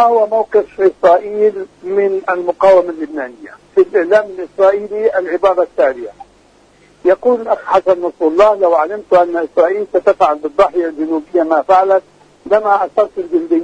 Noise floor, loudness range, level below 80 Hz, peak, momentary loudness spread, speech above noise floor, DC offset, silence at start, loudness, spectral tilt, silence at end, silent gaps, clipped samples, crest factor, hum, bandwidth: -48 dBFS; 2 LU; -52 dBFS; 0 dBFS; 7 LU; 35 dB; under 0.1%; 0 s; -13 LUFS; -6 dB/octave; 0 s; none; under 0.1%; 14 dB; none; 9 kHz